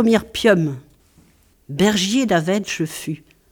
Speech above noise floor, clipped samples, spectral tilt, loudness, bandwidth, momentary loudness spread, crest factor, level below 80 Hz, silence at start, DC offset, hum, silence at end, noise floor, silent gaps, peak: 36 dB; under 0.1%; -4.5 dB/octave; -19 LUFS; 19.5 kHz; 15 LU; 18 dB; -50 dBFS; 0 s; under 0.1%; none; 0.35 s; -55 dBFS; none; -2 dBFS